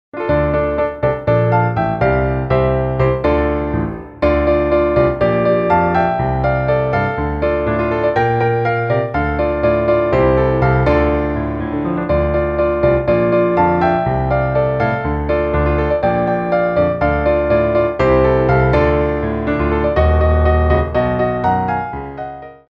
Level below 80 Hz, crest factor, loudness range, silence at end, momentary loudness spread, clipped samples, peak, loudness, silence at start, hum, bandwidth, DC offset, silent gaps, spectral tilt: -26 dBFS; 14 dB; 2 LU; 0.15 s; 5 LU; under 0.1%; -2 dBFS; -16 LUFS; 0.15 s; none; 5.8 kHz; under 0.1%; none; -10 dB/octave